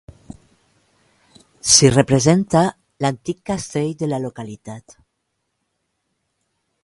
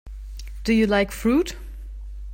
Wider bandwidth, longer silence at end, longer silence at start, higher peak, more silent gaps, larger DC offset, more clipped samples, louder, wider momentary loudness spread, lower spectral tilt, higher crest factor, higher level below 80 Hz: second, 11.5 kHz vs 16.5 kHz; first, 2.05 s vs 0 s; first, 1.65 s vs 0.05 s; first, 0 dBFS vs -8 dBFS; neither; neither; neither; first, -17 LUFS vs -22 LUFS; about the same, 22 LU vs 20 LU; second, -4 dB/octave vs -5.5 dB/octave; about the same, 20 dB vs 16 dB; second, -50 dBFS vs -36 dBFS